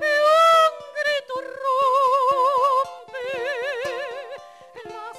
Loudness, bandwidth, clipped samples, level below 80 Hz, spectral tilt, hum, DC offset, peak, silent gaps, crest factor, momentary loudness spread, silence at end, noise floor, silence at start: -20 LUFS; 14.5 kHz; under 0.1%; -70 dBFS; -1 dB/octave; none; under 0.1%; -8 dBFS; none; 14 dB; 20 LU; 0 s; -42 dBFS; 0 s